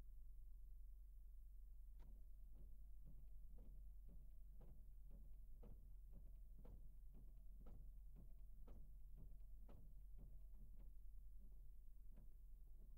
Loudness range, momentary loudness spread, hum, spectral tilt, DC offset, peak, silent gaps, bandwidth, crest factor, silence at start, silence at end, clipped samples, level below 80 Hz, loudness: 0 LU; 2 LU; none; -8 dB/octave; under 0.1%; -48 dBFS; none; 16 kHz; 10 dB; 0 s; 0 s; under 0.1%; -60 dBFS; -67 LUFS